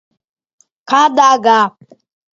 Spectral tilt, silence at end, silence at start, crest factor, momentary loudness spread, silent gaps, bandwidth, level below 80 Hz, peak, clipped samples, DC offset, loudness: -2.5 dB/octave; 0.65 s; 0.9 s; 14 dB; 6 LU; none; 7.6 kHz; -68 dBFS; 0 dBFS; under 0.1%; under 0.1%; -11 LUFS